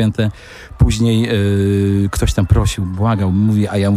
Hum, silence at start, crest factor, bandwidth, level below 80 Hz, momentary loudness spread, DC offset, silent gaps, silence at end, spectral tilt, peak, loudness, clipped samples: none; 0 s; 14 dB; 15 kHz; -24 dBFS; 5 LU; under 0.1%; none; 0 s; -6.5 dB/octave; 0 dBFS; -15 LUFS; under 0.1%